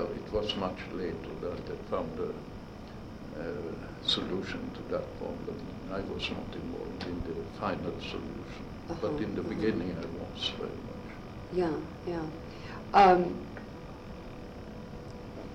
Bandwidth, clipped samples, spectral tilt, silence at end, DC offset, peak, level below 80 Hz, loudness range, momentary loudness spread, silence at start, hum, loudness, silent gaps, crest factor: 15.5 kHz; under 0.1%; -6 dB/octave; 0 s; under 0.1%; -10 dBFS; -50 dBFS; 8 LU; 14 LU; 0 s; none; -33 LUFS; none; 24 dB